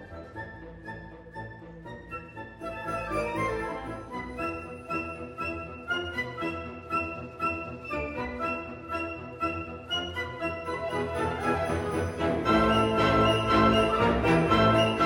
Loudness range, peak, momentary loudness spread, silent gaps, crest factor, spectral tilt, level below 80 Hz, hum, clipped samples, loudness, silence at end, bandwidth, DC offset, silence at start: 11 LU; -8 dBFS; 19 LU; none; 20 dB; -6 dB/octave; -46 dBFS; none; under 0.1%; -28 LUFS; 0 s; 17 kHz; under 0.1%; 0 s